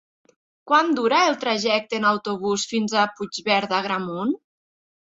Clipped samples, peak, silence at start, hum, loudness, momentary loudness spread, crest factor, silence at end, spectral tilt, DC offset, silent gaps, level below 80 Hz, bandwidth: under 0.1%; -4 dBFS; 0.65 s; none; -22 LUFS; 8 LU; 18 dB; 0.7 s; -3.5 dB/octave; under 0.1%; none; -68 dBFS; 8 kHz